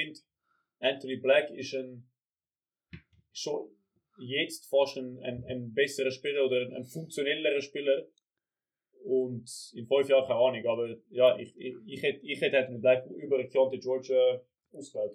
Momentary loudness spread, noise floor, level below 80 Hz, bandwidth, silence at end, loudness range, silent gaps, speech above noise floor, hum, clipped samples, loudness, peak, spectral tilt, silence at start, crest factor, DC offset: 15 LU; under -90 dBFS; -74 dBFS; 14 kHz; 0 s; 6 LU; none; over 60 dB; none; under 0.1%; -30 LUFS; -12 dBFS; -4 dB/octave; 0 s; 20 dB; under 0.1%